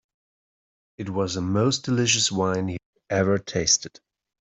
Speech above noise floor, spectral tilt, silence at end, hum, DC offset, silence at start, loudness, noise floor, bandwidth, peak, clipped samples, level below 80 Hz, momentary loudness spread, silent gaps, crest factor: over 67 dB; -3.5 dB/octave; 0.5 s; none; under 0.1%; 1 s; -23 LUFS; under -90 dBFS; 8.2 kHz; -6 dBFS; under 0.1%; -58 dBFS; 12 LU; 2.86-2.93 s; 20 dB